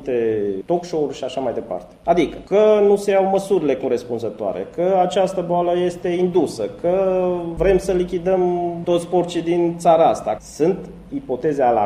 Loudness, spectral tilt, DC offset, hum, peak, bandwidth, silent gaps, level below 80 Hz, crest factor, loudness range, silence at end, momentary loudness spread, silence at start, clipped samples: -19 LUFS; -6.5 dB/octave; under 0.1%; none; -2 dBFS; 13 kHz; none; -44 dBFS; 16 dB; 2 LU; 0 s; 10 LU; 0 s; under 0.1%